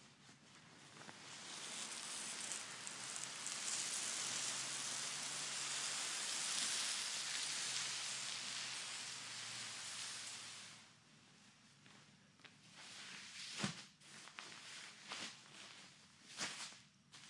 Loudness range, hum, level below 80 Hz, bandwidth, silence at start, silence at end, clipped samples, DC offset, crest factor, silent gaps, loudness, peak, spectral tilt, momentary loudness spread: 11 LU; none; under -90 dBFS; 12 kHz; 0 s; 0 s; under 0.1%; under 0.1%; 26 dB; none; -43 LUFS; -22 dBFS; 0 dB/octave; 22 LU